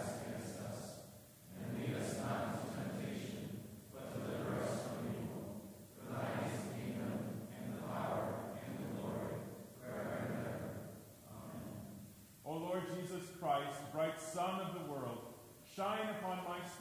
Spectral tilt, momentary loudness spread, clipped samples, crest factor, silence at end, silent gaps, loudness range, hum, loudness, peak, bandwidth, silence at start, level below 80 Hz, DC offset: -5.5 dB/octave; 13 LU; under 0.1%; 18 dB; 0 s; none; 4 LU; none; -44 LUFS; -24 dBFS; 16 kHz; 0 s; -68 dBFS; under 0.1%